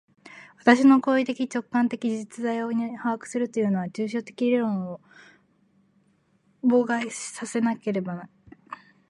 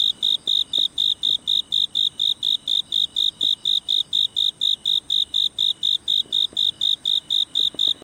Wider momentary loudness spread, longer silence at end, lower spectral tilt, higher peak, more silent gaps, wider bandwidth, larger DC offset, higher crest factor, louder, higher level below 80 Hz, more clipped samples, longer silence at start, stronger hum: first, 15 LU vs 2 LU; first, 0.35 s vs 0.1 s; first, -5.5 dB/octave vs 0 dB/octave; first, -2 dBFS vs -10 dBFS; neither; second, 11.5 kHz vs 16.5 kHz; neither; first, 24 dB vs 12 dB; second, -25 LUFS vs -19 LUFS; second, -74 dBFS vs -62 dBFS; neither; first, 0.25 s vs 0 s; neither